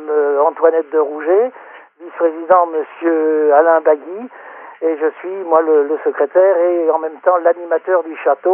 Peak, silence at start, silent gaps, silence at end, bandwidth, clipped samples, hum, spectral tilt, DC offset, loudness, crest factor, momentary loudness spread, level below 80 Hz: 0 dBFS; 0 s; none; 0 s; 3.2 kHz; under 0.1%; none; -3 dB/octave; under 0.1%; -15 LUFS; 14 dB; 10 LU; -76 dBFS